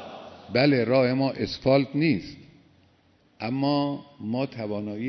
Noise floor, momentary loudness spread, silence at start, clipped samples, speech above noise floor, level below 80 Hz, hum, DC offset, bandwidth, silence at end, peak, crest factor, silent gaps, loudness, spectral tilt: -62 dBFS; 14 LU; 0 s; under 0.1%; 37 dB; -60 dBFS; none; under 0.1%; 6.2 kHz; 0 s; -6 dBFS; 20 dB; none; -25 LUFS; -8 dB/octave